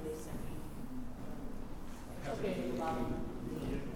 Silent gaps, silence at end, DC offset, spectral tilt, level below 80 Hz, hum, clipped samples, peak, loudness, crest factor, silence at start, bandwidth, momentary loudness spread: none; 0 s; under 0.1%; -6.5 dB/octave; -46 dBFS; none; under 0.1%; -24 dBFS; -42 LUFS; 14 dB; 0 s; 16.5 kHz; 10 LU